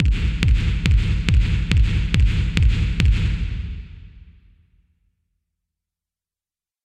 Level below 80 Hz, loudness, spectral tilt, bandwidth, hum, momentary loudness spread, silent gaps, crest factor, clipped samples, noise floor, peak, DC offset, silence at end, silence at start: -22 dBFS; -20 LUFS; -6 dB/octave; 9.2 kHz; none; 10 LU; none; 18 dB; under 0.1%; under -90 dBFS; -2 dBFS; under 0.1%; 2.65 s; 0 s